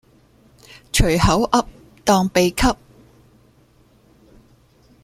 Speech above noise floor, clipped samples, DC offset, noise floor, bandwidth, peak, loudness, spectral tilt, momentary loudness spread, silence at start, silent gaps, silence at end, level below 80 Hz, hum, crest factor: 38 dB; under 0.1%; under 0.1%; -54 dBFS; 16 kHz; -2 dBFS; -18 LUFS; -4.5 dB/octave; 8 LU; 0.95 s; none; 2.3 s; -32 dBFS; none; 20 dB